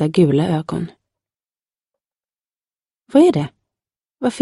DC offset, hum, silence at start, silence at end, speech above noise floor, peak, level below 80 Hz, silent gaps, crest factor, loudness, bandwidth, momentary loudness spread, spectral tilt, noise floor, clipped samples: under 0.1%; none; 0 s; 0 s; over 75 dB; -2 dBFS; -56 dBFS; none; 18 dB; -17 LUFS; 11.5 kHz; 14 LU; -7.5 dB/octave; under -90 dBFS; under 0.1%